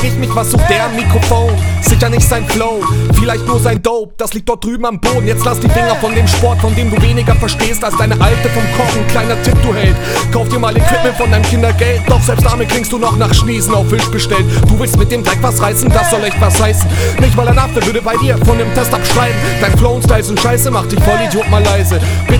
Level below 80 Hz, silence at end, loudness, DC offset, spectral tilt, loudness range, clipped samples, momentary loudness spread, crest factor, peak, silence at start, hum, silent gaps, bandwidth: -18 dBFS; 0 s; -11 LUFS; under 0.1%; -5 dB/octave; 2 LU; 0.4%; 3 LU; 10 dB; 0 dBFS; 0 s; none; none; 20 kHz